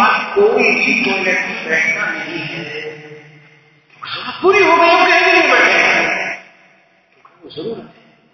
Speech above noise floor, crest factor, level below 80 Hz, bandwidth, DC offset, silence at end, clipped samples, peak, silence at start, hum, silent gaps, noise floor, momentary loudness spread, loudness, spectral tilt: 38 dB; 16 dB; -58 dBFS; 6.6 kHz; under 0.1%; 0.45 s; under 0.1%; 0 dBFS; 0 s; none; none; -52 dBFS; 19 LU; -12 LUFS; -3.5 dB/octave